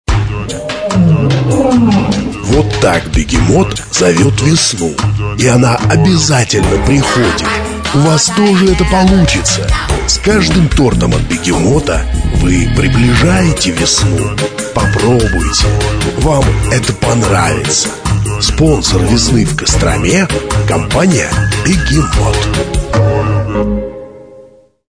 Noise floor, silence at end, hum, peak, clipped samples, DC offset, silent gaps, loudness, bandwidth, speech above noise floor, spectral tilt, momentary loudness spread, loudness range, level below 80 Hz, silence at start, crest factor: -40 dBFS; 0.5 s; none; 0 dBFS; under 0.1%; under 0.1%; none; -11 LUFS; 11 kHz; 30 dB; -5 dB/octave; 6 LU; 2 LU; -20 dBFS; 0.1 s; 10 dB